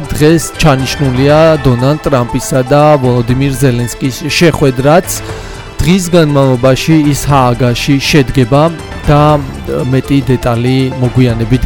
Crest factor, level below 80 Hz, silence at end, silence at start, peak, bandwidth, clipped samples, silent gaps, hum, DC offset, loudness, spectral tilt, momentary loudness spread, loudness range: 8 dB; -26 dBFS; 0 s; 0 s; 0 dBFS; 19 kHz; 0.2%; none; none; under 0.1%; -10 LUFS; -6 dB/octave; 6 LU; 2 LU